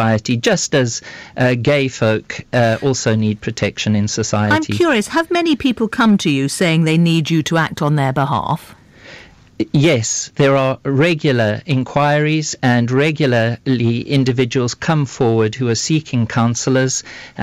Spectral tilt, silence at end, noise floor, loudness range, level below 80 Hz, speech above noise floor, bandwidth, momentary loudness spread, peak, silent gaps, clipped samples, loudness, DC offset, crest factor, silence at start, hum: -5 dB/octave; 0 s; -40 dBFS; 2 LU; -48 dBFS; 25 dB; 15 kHz; 5 LU; -6 dBFS; none; under 0.1%; -16 LUFS; under 0.1%; 10 dB; 0 s; none